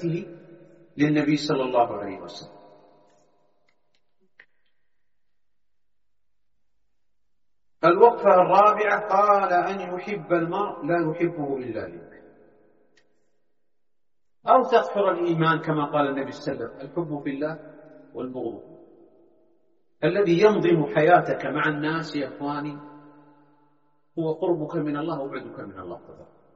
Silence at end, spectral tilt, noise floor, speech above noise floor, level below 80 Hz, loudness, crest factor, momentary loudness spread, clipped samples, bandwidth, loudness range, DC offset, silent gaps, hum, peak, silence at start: 0.3 s; -5 dB/octave; -85 dBFS; 62 dB; -68 dBFS; -23 LUFS; 22 dB; 20 LU; under 0.1%; 7.6 kHz; 12 LU; under 0.1%; none; none; -2 dBFS; 0 s